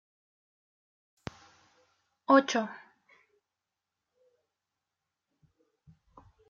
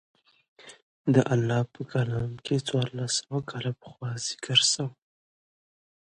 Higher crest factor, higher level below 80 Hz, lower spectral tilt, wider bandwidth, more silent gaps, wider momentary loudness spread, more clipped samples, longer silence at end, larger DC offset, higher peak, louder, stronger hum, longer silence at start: about the same, 26 dB vs 24 dB; second, -72 dBFS vs -62 dBFS; second, -2.5 dB/octave vs -4 dB/octave; second, 7.4 kHz vs 11 kHz; second, none vs 0.82-1.04 s; first, 23 LU vs 12 LU; neither; first, 3.7 s vs 1.2 s; neither; second, -10 dBFS vs -6 dBFS; about the same, -27 LUFS vs -27 LUFS; neither; first, 2.3 s vs 0.6 s